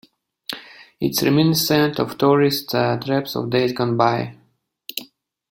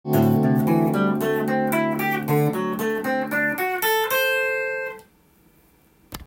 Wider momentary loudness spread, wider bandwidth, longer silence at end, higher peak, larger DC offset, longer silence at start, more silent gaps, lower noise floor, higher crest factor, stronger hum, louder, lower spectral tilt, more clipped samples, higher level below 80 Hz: first, 16 LU vs 6 LU; about the same, 17 kHz vs 17 kHz; first, 0.5 s vs 0.05 s; first, -2 dBFS vs -6 dBFS; neither; first, 0.5 s vs 0.05 s; neither; first, -62 dBFS vs -57 dBFS; about the same, 18 dB vs 16 dB; neither; first, -19 LUFS vs -22 LUFS; about the same, -5 dB/octave vs -6 dB/octave; neither; about the same, -58 dBFS vs -58 dBFS